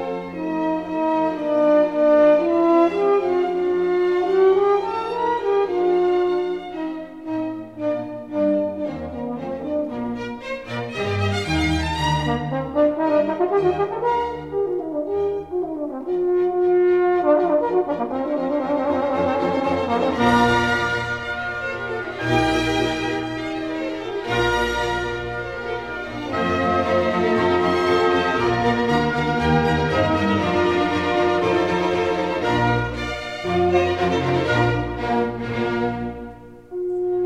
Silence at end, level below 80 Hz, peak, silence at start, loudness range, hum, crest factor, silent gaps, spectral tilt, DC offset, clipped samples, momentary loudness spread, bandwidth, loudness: 0 s; -42 dBFS; -4 dBFS; 0 s; 6 LU; none; 16 dB; none; -6.5 dB/octave; 0.2%; under 0.1%; 10 LU; 11 kHz; -21 LUFS